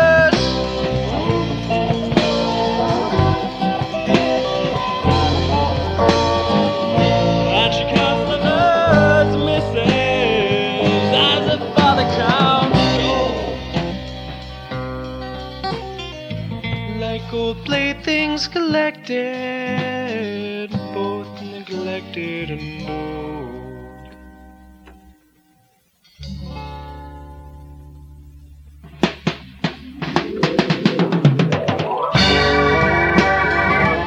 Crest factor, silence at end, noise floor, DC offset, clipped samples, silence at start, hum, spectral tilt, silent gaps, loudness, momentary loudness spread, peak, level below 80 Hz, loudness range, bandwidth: 18 dB; 0 s; -59 dBFS; under 0.1%; under 0.1%; 0 s; none; -6 dB/octave; none; -18 LUFS; 15 LU; 0 dBFS; -36 dBFS; 18 LU; 10.5 kHz